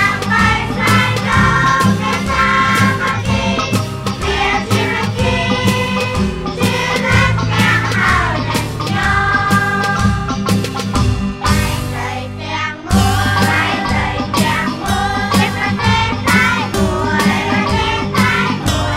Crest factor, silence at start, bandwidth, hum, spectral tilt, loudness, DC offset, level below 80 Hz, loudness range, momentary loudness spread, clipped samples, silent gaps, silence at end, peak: 12 dB; 0 s; 16 kHz; none; -5 dB/octave; -14 LUFS; under 0.1%; -28 dBFS; 3 LU; 6 LU; under 0.1%; none; 0 s; -2 dBFS